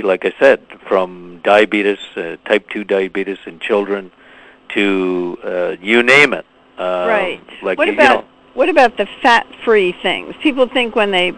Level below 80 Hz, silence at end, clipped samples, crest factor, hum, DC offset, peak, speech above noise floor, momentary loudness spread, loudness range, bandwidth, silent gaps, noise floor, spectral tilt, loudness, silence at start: -54 dBFS; 0 s; 0.1%; 16 dB; none; under 0.1%; 0 dBFS; 25 dB; 12 LU; 5 LU; 11 kHz; none; -40 dBFS; -4.5 dB/octave; -15 LUFS; 0 s